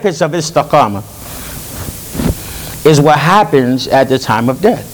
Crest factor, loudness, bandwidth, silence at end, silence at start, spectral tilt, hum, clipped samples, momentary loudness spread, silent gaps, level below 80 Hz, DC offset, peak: 12 dB; -11 LUFS; over 20 kHz; 0 s; 0 s; -5.5 dB/octave; none; 0.5%; 16 LU; none; -34 dBFS; under 0.1%; 0 dBFS